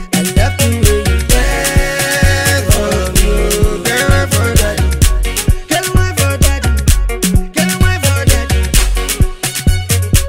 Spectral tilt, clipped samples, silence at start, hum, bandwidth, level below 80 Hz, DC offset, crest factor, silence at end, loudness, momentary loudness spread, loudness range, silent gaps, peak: -4 dB/octave; 0.2%; 0 s; none; 17 kHz; -16 dBFS; 0.2%; 12 dB; 0 s; -13 LUFS; 3 LU; 1 LU; none; 0 dBFS